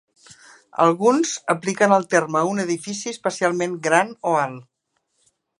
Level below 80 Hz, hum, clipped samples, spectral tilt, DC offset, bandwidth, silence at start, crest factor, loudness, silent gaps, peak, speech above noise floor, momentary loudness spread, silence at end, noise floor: -74 dBFS; none; under 0.1%; -4.5 dB/octave; under 0.1%; 11.5 kHz; 0.8 s; 20 dB; -20 LUFS; none; 0 dBFS; 52 dB; 9 LU; 1 s; -72 dBFS